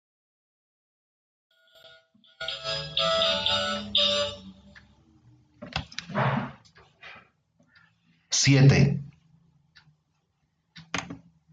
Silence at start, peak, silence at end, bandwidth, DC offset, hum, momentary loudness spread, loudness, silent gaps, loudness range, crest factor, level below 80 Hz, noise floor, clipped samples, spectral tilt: 2.4 s; -8 dBFS; 0.35 s; 9.2 kHz; under 0.1%; none; 25 LU; -25 LUFS; none; 9 LU; 22 dB; -56 dBFS; -74 dBFS; under 0.1%; -4 dB/octave